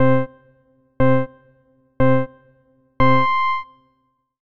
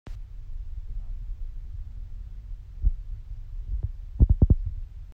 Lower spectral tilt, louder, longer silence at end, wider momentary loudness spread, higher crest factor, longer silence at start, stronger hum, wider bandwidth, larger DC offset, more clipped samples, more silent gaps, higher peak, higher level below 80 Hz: second, -9 dB/octave vs -11.5 dB/octave; first, -19 LUFS vs -29 LUFS; about the same, 0 s vs 0 s; second, 16 LU vs 20 LU; second, 14 dB vs 22 dB; about the same, 0 s vs 0.05 s; neither; first, 6.6 kHz vs 1.7 kHz; neither; neither; neither; about the same, -6 dBFS vs -6 dBFS; second, -42 dBFS vs -28 dBFS